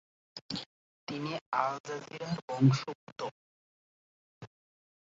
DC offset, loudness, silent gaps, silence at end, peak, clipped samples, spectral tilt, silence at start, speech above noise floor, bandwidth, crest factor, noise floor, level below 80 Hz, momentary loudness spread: under 0.1%; -34 LUFS; 0.41-0.49 s, 0.66-1.07 s, 1.41-1.52 s, 1.80-1.84 s, 2.42-2.48 s, 2.95-3.16 s, 3.31-4.41 s; 0.6 s; -12 dBFS; under 0.1%; -6 dB/octave; 0.35 s; over 58 dB; 7.8 kHz; 24 dB; under -90 dBFS; -74 dBFS; 26 LU